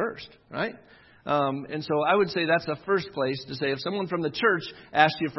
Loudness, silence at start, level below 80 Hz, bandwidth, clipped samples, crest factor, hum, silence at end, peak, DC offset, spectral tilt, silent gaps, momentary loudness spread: -26 LUFS; 0 s; -66 dBFS; 6 kHz; under 0.1%; 24 dB; none; 0 s; -2 dBFS; under 0.1%; -6.5 dB/octave; none; 10 LU